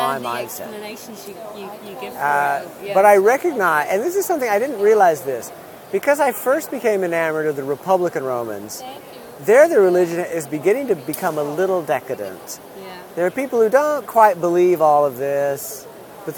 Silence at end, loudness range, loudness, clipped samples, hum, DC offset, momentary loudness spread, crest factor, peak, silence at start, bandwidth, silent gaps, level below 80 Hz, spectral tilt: 0 s; 5 LU; -18 LUFS; under 0.1%; none; under 0.1%; 19 LU; 18 dB; 0 dBFS; 0 s; 19.5 kHz; none; -66 dBFS; -4.5 dB/octave